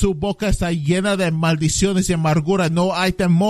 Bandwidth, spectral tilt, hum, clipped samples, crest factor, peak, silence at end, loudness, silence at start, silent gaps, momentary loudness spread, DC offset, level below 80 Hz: 13.5 kHz; -5.5 dB/octave; none; under 0.1%; 14 dB; -4 dBFS; 0 s; -18 LUFS; 0 s; none; 3 LU; under 0.1%; -32 dBFS